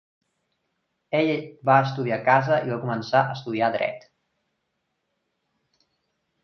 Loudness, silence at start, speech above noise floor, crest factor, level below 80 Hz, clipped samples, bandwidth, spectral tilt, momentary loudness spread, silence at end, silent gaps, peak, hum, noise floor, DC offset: -23 LUFS; 1.1 s; 54 dB; 22 dB; -70 dBFS; under 0.1%; 6.6 kHz; -7.5 dB/octave; 8 LU; 2.45 s; none; -4 dBFS; none; -77 dBFS; under 0.1%